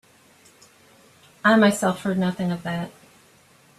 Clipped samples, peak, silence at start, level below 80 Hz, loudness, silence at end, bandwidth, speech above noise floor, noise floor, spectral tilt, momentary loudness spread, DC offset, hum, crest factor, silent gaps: under 0.1%; -4 dBFS; 1.45 s; -64 dBFS; -22 LUFS; 0.9 s; 13.5 kHz; 34 dB; -55 dBFS; -5.5 dB/octave; 13 LU; under 0.1%; none; 20 dB; none